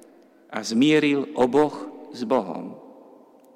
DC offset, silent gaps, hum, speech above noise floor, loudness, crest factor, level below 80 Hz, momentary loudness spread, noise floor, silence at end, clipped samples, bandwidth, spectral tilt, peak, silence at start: under 0.1%; none; none; 31 dB; -22 LUFS; 14 dB; -66 dBFS; 18 LU; -52 dBFS; 0.65 s; under 0.1%; 12.5 kHz; -5 dB/octave; -10 dBFS; 0.5 s